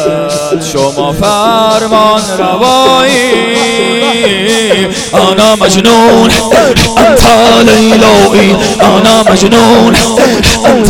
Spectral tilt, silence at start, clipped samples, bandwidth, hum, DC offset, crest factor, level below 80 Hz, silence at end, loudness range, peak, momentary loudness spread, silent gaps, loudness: -4 dB/octave; 0 s; 4%; 18 kHz; none; under 0.1%; 6 dB; -26 dBFS; 0 s; 3 LU; 0 dBFS; 6 LU; none; -6 LUFS